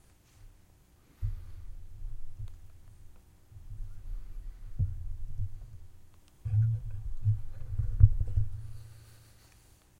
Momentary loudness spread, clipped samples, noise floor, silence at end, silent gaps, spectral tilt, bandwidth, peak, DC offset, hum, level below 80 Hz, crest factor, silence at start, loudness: 24 LU; under 0.1%; -61 dBFS; 0.85 s; none; -8.5 dB/octave; 4.7 kHz; -6 dBFS; under 0.1%; none; -38 dBFS; 26 dB; 0.4 s; -33 LUFS